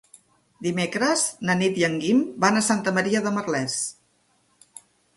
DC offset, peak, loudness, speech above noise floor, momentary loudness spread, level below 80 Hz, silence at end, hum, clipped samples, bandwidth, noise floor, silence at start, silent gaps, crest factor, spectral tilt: under 0.1%; -6 dBFS; -23 LUFS; 43 dB; 7 LU; -66 dBFS; 1.25 s; 60 Hz at -50 dBFS; under 0.1%; 12 kHz; -65 dBFS; 0.6 s; none; 20 dB; -4 dB/octave